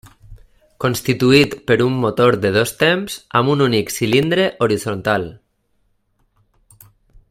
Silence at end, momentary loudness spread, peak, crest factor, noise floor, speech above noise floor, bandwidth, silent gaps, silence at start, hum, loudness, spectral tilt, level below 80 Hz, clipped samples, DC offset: 1.95 s; 7 LU; 0 dBFS; 18 dB; -64 dBFS; 48 dB; 16 kHz; none; 0.3 s; none; -16 LUFS; -5 dB/octave; -50 dBFS; under 0.1%; under 0.1%